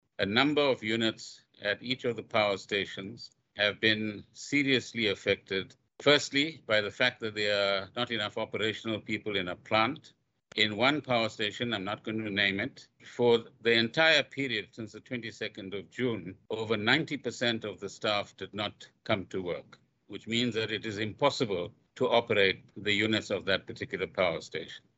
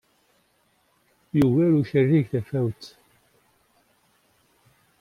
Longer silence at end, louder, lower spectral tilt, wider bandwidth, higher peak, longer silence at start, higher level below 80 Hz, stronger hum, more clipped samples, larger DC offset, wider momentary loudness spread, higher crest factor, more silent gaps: second, 0.2 s vs 2.15 s; second, -30 LUFS vs -22 LUFS; second, -4.5 dB/octave vs -9 dB/octave; second, 8.2 kHz vs 15 kHz; about the same, -8 dBFS vs -8 dBFS; second, 0.2 s vs 1.35 s; second, -70 dBFS vs -60 dBFS; neither; neither; neither; about the same, 14 LU vs 12 LU; about the same, 22 dB vs 18 dB; neither